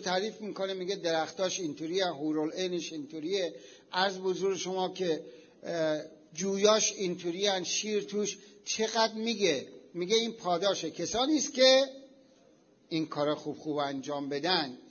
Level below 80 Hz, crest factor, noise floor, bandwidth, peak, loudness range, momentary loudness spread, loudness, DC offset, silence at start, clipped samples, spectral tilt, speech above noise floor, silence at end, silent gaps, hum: -74 dBFS; 22 dB; -63 dBFS; 7 kHz; -10 dBFS; 5 LU; 11 LU; -31 LUFS; under 0.1%; 0 s; under 0.1%; -3 dB/octave; 32 dB; 0 s; none; none